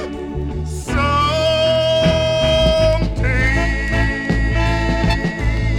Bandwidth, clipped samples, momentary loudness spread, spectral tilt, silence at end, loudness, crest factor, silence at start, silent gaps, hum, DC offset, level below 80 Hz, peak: 12 kHz; under 0.1%; 9 LU; -5.5 dB/octave; 0 s; -17 LUFS; 14 dB; 0 s; none; none; under 0.1%; -22 dBFS; -4 dBFS